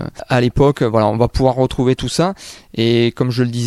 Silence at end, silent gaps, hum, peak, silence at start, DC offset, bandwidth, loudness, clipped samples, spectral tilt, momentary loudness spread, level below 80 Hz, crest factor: 0 s; none; none; -2 dBFS; 0 s; under 0.1%; 13 kHz; -16 LUFS; under 0.1%; -6.5 dB/octave; 5 LU; -34 dBFS; 14 dB